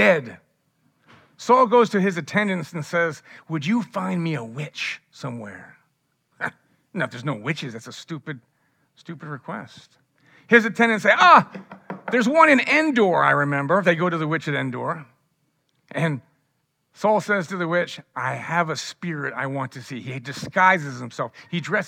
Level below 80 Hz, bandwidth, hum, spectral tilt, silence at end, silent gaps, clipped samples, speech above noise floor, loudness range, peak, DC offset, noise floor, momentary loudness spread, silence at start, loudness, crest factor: -78 dBFS; 16 kHz; none; -5.5 dB/octave; 0 s; none; under 0.1%; 50 dB; 14 LU; 0 dBFS; under 0.1%; -72 dBFS; 19 LU; 0 s; -21 LUFS; 22 dB